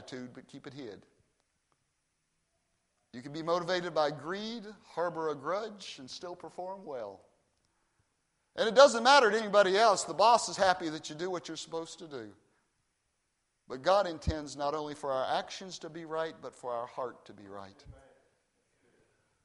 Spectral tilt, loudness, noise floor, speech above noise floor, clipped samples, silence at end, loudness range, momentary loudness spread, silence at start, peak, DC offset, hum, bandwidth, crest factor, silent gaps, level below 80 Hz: -3.5 dB/octave; -30 LUFS; -80 dBFS; 48 dB; under 0.1%; 1.5 s; 16 LU; 22 LU; 0 s; -6 dBFS; under 0.1%; none; 11.5 kHz; 26 dB; none; -58 dBFS